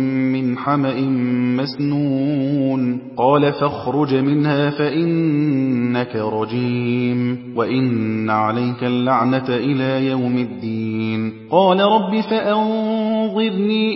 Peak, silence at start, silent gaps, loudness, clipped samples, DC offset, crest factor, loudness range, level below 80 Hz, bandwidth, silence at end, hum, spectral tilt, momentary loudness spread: -2 dBFS; 0 s; none; -18 LUFS; under 0.1%; under 0.1%; 16 dB; 2 LU; -60 dBFS; 5.8 kHz; 0 s; none; -12 dB/octave; 6 LU